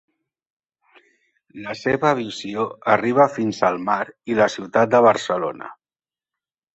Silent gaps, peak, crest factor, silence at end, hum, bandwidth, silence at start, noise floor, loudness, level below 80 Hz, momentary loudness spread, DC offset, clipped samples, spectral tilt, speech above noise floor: none; -2 dBFS; 20 dB; 1 s; none; 8.2 kHz; 1.55 s; under -90 dBFS; -20 LUFS; -62 dBFS; 13 LU; under 0.1%; under 0.1%; -5.5 dB/octave; over 70 dB